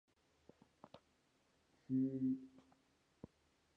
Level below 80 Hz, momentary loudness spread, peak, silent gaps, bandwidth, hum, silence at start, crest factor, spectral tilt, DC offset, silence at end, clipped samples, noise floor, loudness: -82 dBFS; 24 LU; -30 dBFS; none; 5.8 kHz; none; 0.95 s; 18 dB; -9.5 dB/octave; under 0.1%; 1.3 s; under 0.1%; -78 dBFS; -41 LUFS